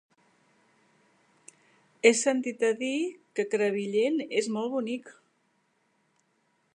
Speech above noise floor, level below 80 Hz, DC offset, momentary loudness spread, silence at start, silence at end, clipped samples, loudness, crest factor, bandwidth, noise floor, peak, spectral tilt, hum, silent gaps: 45 dB; -86 dBFS; under 0.1%; 10 LU; 2.05 s; 1.65 s; under 0.1%; -28 LUFS; 24 dB; 11 kHz; -72 dBFS; -6 dBFS; -3.5 dB/octave; none; none